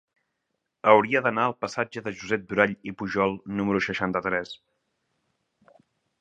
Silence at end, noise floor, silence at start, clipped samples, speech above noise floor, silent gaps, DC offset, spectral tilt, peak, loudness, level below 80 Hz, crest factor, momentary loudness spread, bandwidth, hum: 1.65 s; -80 dBFS; 0.85 s; under 0.1%; 55 dB; none; under 0.1%; -6 dB/octave; -2 dBFS; -25 LUFS; -62 dBFS; 26 dB; 12 LU; 9 kHz; none